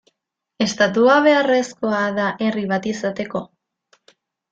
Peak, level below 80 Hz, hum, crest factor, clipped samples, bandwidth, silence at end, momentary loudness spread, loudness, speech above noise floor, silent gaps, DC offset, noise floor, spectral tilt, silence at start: -2 dBFS; -62 dBFS; none; 18 dB; under 0.1%; 9 kHz; 1.05 s; 11 LU; -19 LUFS; 59 dB; none; under 0.1%; -77 dBFS; -4.5 dB/octave; 0.6 s